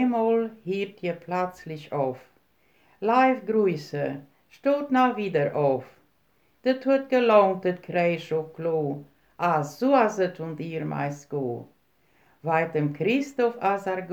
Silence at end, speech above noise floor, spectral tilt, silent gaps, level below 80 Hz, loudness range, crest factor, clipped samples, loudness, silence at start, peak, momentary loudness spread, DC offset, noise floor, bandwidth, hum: 0 s; 42 dB; -7 dB/octave; none; -74 dBFS; 4 LU; 20 dB; under 0.1%; -25 LUFS; 0 s; -6 dBFS; 11 LU; under 0.1%; -67 dBFS; 19 kHz; none